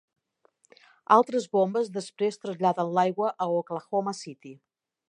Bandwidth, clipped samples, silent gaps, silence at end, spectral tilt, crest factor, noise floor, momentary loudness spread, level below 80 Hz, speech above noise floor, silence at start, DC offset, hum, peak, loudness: 11 kHz; under 0.1%; none; 0.55 s; -6 dB/octave; 22 dB; -67 dBFS; 15 LU; -82 dBFS; 41 dB; 1.1 s; under 0.1%; none; -6 dBFS; -26 LUFS